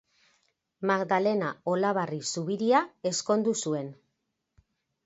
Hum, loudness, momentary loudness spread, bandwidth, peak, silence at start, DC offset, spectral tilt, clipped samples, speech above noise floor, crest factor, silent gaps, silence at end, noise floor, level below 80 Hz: none; -28 LUFS; 7 LU; 8 kHz; -10 dBFS; 0.8 s; under 0.1%; -4.5 dB/octave; under 0.1%; 53 dB; 20 dB; none; 1.1 s; -80 dBFS; -76 dBFS